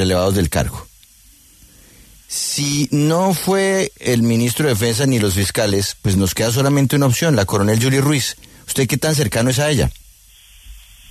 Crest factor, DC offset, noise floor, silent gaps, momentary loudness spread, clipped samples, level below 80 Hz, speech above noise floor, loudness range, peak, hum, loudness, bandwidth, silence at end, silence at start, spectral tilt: 16 dB; under 0.1%; -48 dBFS; none; 5 LU; under 0.1%; -38 dBFS; 32 dB; 4 LU; -2 dBFS; none; -17 LUFS; 14 kHz; 0.35 s; 0 s; -5 dB/octave